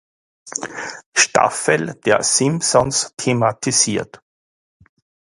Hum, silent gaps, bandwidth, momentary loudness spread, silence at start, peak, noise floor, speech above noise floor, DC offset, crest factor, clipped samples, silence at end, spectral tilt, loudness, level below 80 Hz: none; 1.06-1.12 s; 11.5 kHz; 13 LU; 0.45 s; 0 dBFS; under -90 dBFS; over 72 dB; under 0.1%; 20 dB; under 0.1%; 1.1 s; -3 dB/octave; -17 LUFS; -54 dBFS